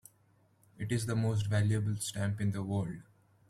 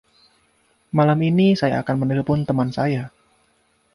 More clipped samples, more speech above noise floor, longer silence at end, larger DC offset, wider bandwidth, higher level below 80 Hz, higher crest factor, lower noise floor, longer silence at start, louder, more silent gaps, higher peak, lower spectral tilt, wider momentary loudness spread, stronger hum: neither; second, 36 dB vs 44 dB; second, 0.5 s vs 0.85 s; neither; first, 13.5 kHz vs 11.5 kHz; second, -62 dBFS vs -54 dBFS; about the same, 14 dB vs 16 dB; first, -68 dBFS vs -63 dBFS; second, 0.8 s vs 0.95 s; second, -34 LUFS vs -20 LUFS; neither; second, -20 dBFS vs -4 dBFS; second, -6 dB/octave vs -8.5 dB/octave; about the same, 9 LU vs 8 LU; neither